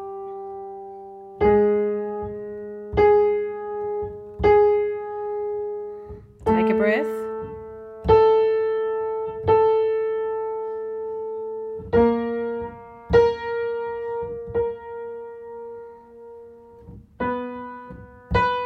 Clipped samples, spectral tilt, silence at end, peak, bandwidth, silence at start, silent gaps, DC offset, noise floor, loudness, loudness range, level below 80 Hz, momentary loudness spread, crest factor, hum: under 0.1%; -8 dB/octave; 0 s; -4 dBFS; 5.8 kHz; 0 s; none; under 0.1%; -45 dBFS; -22 LUFS; 10 LU; -44 dBFS; 20 LU; 18 dB; none